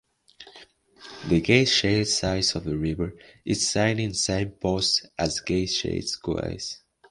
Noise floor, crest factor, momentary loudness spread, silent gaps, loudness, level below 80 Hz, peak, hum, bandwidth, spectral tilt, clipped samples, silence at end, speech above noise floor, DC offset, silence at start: -52 dBFS; 24 dB; 13 LU; none; -24 LUFS; -46 dBFS; -2 dBFS; none; 11.5 kHz; -4 dB/octave; under 0.1%; 0.35 s; 27 dB; under 0.1%; 0.4 s